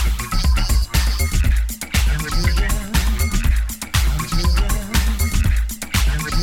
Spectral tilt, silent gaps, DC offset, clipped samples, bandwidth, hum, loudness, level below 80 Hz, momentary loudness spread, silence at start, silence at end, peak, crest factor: -4 dB/octave; none; under 0.1%; under 0.1%; 17.5 kHz; none; -20 LUFS; -18 dBFS; 3 LU; 0 s; 0 s; -4 dBFS; 14 dB